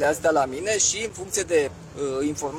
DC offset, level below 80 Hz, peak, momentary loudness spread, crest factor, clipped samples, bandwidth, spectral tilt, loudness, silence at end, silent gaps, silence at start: under 0.1%; -54 dBFS; -8 dBFS; 8 LU; 16 dB; under 0.1%; 17.5 kHz; -2.5 dB/octave; -24 LUFS; 0 s; none; 0 s